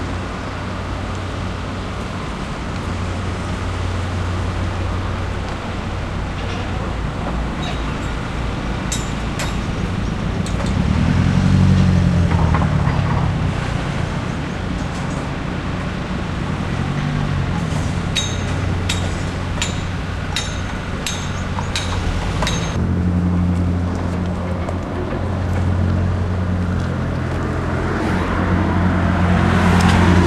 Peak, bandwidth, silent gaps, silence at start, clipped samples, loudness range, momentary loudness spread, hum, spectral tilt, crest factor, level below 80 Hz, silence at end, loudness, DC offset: -2 dBFS; 12 kHz; none; 0 s; under 0.1%; 7 LU; 9 LU; none; -6 dB/octave; 18 dB; -28 dBFS; 0 s; -20 LUFS; under 0.1%